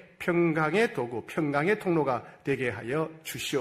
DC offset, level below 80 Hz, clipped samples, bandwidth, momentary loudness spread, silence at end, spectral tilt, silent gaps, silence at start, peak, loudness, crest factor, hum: under 0.1%; -66 dBFS; under 0.1%; 15.5 kHz; 8 LU; 0 s; -5.5 dB/octave; none; 0.2 s; -12 dBFS; -28 LUFS; 16 dB; none